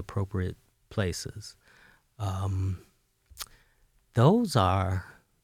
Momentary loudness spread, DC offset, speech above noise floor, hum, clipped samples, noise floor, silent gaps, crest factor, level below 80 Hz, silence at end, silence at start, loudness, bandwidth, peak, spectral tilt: 20 LU; under 0.1%; 38 dB; none; under 0.1%; -66 dBFS; none; 22 dB; -54 dBFS; 0.3 s; 0 s; -28 LUFS; 16 kHz; -8 dBFS; -6.5 dB/octave